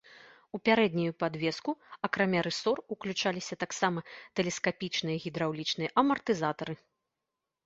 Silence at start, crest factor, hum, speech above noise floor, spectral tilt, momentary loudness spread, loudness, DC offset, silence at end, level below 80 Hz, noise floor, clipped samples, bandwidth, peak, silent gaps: 0.1 s; 22 dB; none; 56 dB; -4.5 dB/octave; 10 LU; -31 LUFS; under 0.1%; 0.9 s; -70 dBFS; -87 dBFS; under 0.1%; 8 kHz; -10 dBFS; none